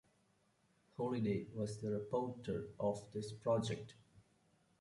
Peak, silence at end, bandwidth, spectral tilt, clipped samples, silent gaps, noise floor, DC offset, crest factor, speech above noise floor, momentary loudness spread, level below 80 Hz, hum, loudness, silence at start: -24 dBFS; 0.6 s; 11.5 kHz; -7 dB/octave; under 0.1%; none; -76 dBFS; under 0.1%; 18 dB; 36 dB; 9 LU; -70 dBFS; none; -41 LUFS; 1 s